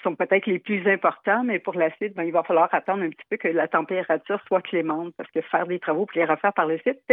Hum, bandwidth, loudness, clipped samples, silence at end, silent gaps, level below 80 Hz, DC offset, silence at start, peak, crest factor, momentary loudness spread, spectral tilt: none; 3.9 kHz; -24 LUFS; under 0.1%; 0 s; none; -86 dBFS; under 0.1%; 0.05 s; -4 dBFS; 20 dB; 7 LU; -9.5 dB/octave